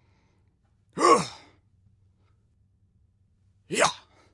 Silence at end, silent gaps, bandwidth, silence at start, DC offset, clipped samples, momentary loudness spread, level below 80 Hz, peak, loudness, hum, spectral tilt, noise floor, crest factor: 0.35 s; none; 11.5 kHz; 0.95 s; under 0.1%; under 0.1%; 23 LU; -70 dBFS; -6 dBFS; -24 LUFS; none; -3 dB/octave; -66 dBFS; 24 dB